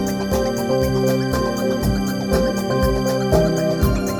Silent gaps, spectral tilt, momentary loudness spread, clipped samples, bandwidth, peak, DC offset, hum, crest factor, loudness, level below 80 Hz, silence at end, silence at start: none; -6 dB/octave; 3 LU; under 0.1%; over 20 kHz; -2 dBFS; under 0.1%; none; 16 dB; -19 LUFS; -28 dBFS; 0 s; 0 s